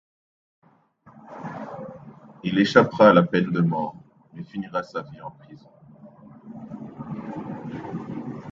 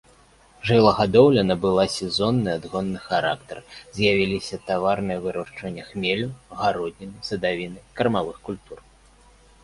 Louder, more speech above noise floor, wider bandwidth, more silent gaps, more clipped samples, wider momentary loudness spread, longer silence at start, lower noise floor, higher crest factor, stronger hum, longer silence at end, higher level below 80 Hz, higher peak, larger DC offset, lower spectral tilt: about the same, -23 LUFS vs -22 LUFS; about the same, 35 dB vs 32 dB; second, 7.4 kHz vs 11.5 kHz; neither; neither; first, 26 LU vs 17 LU; first, 1.15 s vs 0.65 s; about the same, -56 dBFS vs -54 dBFS; about the same, 24 dB vs 20 dB; neither; second, 0 s vs 0.85 s; second, -62 dBFS vs -50 dBFS; about the same, 0 dBFS vs -2 dBFS; neither; first, -7.5 dB/octave vs -6 dB/octave